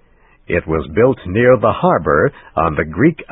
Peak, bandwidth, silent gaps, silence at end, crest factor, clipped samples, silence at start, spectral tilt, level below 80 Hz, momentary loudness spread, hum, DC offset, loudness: 0 dBFS; 3.9 kHz; none; 0.05 s; 16 dB; under 0.1%; 0.5 s; -12.5 dB/octave; -34 dBFS; 7 LU; none; under 0.1%; -15 LUFS